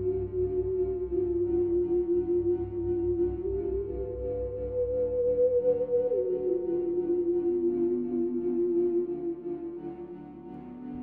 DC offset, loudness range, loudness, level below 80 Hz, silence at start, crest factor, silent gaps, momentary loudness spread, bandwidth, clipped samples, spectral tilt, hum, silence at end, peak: under 0.1%; 3 LU; -29 LUFS; -48 dBFS; 0 s; 12 dB; none; 11 LU; 2.6 kHz; under 0.1%; -12 dB/octave; none; 0 s; -16 dBFS